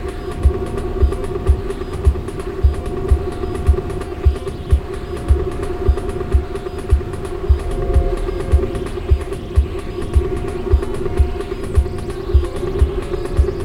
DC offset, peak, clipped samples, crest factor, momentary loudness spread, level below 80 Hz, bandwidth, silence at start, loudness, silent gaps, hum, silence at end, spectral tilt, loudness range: under 0.1%; -2 dBFS; under 0.1%; 16 dB; 7 LU; -20 dBFS; 11.5 kHz; 0 s; -20 LUFS; none; none; 0 s; -8 dB/octave; 1 LU